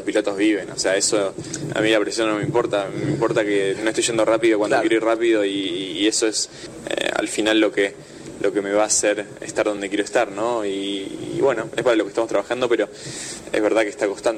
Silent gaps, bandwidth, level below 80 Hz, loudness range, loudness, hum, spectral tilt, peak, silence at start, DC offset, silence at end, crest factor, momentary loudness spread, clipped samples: none; 13 kHz; -58 dBFS; 3 LU; -21 LUFS; none; -3.5 dB/octave; -8 dBFS; 0 s; under 0.1%; 0 s; 14 dB; 9 LU; under 0.1%